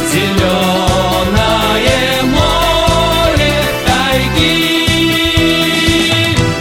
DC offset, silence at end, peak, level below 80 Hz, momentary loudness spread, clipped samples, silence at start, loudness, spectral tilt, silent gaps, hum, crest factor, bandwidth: under 0.1%; 0 s; 0 dBFS; -24 dBFS; 2 LU; under 0.1%; 0 s; -11 LUFS; -4 dB/octave; none; none; 12 dB; 17 kHz